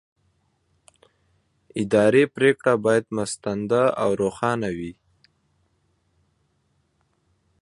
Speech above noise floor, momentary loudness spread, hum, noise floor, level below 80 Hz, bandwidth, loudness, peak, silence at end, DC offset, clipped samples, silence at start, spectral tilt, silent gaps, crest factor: 47 dB; 12 LU; none; -68 dBFS; -60 dBFS; 11.5 kHz; -22 LUFS; -4 dBFS; 2.7 s; under 0.1%; under 0.1%; 1.75 s; -5.5 dB/octave; none; 20 dB